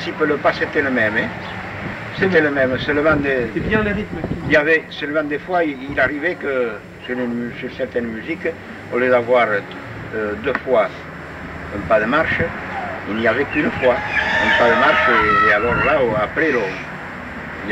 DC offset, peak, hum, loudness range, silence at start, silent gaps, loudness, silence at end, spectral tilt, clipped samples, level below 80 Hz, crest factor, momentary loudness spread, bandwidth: under 0.1%; -4 dBFS; none; 6 LU; 0 s; none; -18 LUFS; 0 s; -6.5 dB/octave; under 0.1%; -42 dBFS; 16 dB; 14 LU; 10.5 kHz